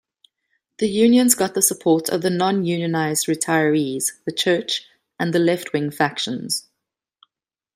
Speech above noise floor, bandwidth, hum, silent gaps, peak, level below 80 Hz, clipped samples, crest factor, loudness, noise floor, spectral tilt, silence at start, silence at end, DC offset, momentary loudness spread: 65 dB; 16 kHz; none; none; 0 dBFS; -66 dBFS; under 0.1%; 20 dB; -20 LUFS; -85 dBFS; -3.5 dB/octave; 0.8 s; 1.15 s; under 0.1%; 10 LU